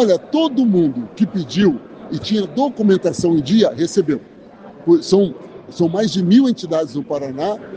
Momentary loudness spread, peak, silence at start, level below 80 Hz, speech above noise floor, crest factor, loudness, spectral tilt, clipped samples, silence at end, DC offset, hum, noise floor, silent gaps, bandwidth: 10 LU; 0 dBFS; 0 s; -56 dBFS; 23 dB; 16 dB; -17 LUFS; -6.5 dB/octave; under 0.1%; 0 s; under 0.1%; none; -39 dBFS; none; 9.4 kHz